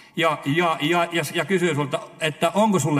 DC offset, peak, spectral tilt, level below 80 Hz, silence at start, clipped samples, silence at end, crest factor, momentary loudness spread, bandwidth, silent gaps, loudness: under 0.1%; -4 dBFS; -5 dB/octave; -68 dBFS; 0.15 s; under 0.1%; 0 s; 18 dB; 6 LU; 15.5 kHz; none; -22 LUFS